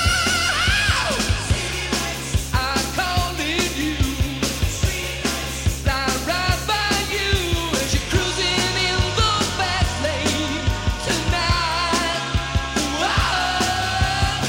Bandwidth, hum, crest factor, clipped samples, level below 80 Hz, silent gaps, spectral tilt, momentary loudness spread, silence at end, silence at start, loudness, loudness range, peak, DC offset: 16.5 kHz; none; 16 dB; under 0.1%; -28 dBFS; none; -3.5 dB/octave; 5 LU; 0 s; 0 s; -20 LUFS; 2 LU; -4 dBFS; under 0.1%